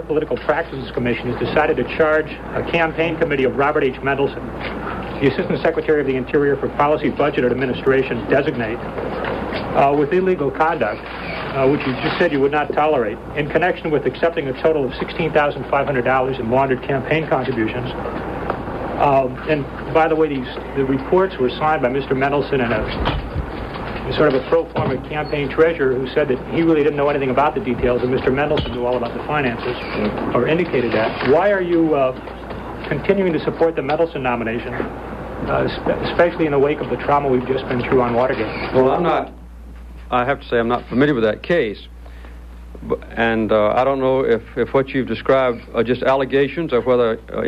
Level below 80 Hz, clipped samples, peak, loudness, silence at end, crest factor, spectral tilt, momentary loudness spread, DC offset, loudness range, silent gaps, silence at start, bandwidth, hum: -38 dBFS; under 0.1%; -2 dBFS; -19 LUFS; 0 s; 16 dB; -8 dB/octave; 9 LU; under 0.1%; 2 LU; none; 0 s; 8 kHz; none